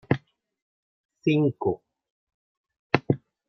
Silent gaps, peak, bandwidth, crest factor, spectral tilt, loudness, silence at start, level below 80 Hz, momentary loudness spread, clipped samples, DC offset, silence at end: 0.62-1.09 s, 2.10-2.27 s, 2.34-2.64 s, 2.79-2.90 s; -2 dBFS; 6.2 kHz; 26 dB; -8.5 dB/octave; -26 LUFS; 0.1 s; -62 dBFS; 6 LU; under 0.1%; under 0.1%; 0.3 s